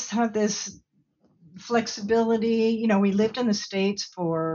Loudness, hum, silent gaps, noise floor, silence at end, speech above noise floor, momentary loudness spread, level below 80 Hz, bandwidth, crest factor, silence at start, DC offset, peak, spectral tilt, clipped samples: -24 LUFS; none; none; -65 dBFS; 0 s; 41 dB; 7 LU; -64 dBFS; 7.4 kHz; 16 dB; 0 s; under 0.1%; -8 dBFS; -5 dB/octave; under 0.1%